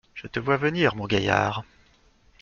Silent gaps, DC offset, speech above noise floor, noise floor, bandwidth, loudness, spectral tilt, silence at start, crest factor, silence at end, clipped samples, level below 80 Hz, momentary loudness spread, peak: none; under 0.1%; 35 dB; -59 dBFS; 7.2 kHz; -24 LUFS; -6 dB/octave; 0.15 s; 22 dB; 0.8 s; under 0.1%; -52 dBFS; 10 LU; -4 dBFS